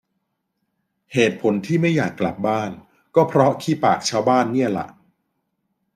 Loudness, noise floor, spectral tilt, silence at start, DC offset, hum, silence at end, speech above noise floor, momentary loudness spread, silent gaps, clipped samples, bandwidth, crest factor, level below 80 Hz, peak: -20 LUFS; -75 dBFS; -6 dB/octave; 1.1 s; under 0.1%; none; 1.05 s; 56 dB; 7 LU; none; under 0.1%; 15 kHz; 18 dB; -62 dBFS; -4 dBFS